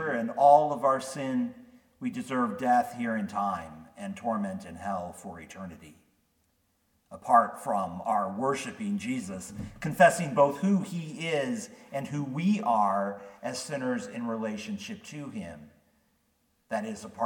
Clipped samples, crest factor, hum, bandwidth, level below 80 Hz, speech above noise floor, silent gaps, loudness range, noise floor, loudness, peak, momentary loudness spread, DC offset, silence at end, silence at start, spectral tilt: under 0.1%; 24 dB; none; 18 kHz; -66 dBFS; 44 dB; none; 10 LU; -72 dBFS; -29 LUFS; -6 dBFS; 18 LU; under 0.1%; 0 s; 0 s; -5.5 dB/octave